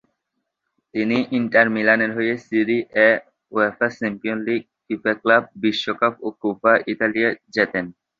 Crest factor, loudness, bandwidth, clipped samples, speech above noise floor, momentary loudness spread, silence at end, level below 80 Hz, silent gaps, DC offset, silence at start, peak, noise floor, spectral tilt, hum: 20 dB; -20 LUFS; 7.4 kHz; under 0.1%; 58 dB; 9 LU; 0.3 s; -64 dBFS; none; under 0.1%; 0.95 s; -2 dBFS; -78 dBFS; -6 dB/octave; none